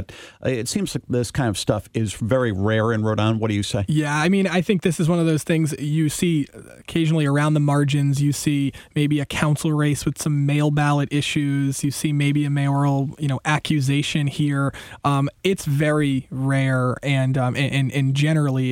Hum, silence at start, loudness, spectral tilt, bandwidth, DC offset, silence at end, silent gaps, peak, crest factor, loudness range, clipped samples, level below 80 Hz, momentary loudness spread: none; 0 s; -21 LUFS; -6 dB/octave; 16 kHz; under 0.1%; 0 s; none; -2 dBFS; 18 dB; 1 LU; under 0.1%; -50 dBFS; 5 LU